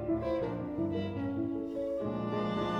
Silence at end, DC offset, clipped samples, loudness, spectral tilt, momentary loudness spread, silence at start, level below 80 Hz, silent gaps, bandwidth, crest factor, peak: 0 s; under 0.1%; under 0.1%; -35 LUFS; -8.5 dB/octave; 3 LU; 0 s; -56 dBFS; none; 7.6 kHz; 12 dB; -20 dBFS